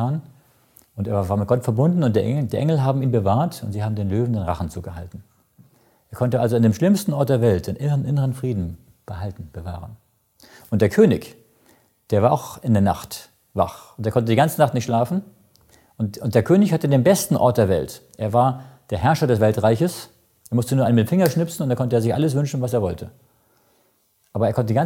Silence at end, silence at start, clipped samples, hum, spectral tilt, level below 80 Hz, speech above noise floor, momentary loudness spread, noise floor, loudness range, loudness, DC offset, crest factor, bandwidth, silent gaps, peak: 0 s; 0 s; under 0.1%; none; -7 dB/octave; -50 dBFS; 44 dB; 15 LU; -64 dBFS; 5 LU; -20 LUFS; under 0.1%; 18 dB; 17 kHz; none; -2 dBFS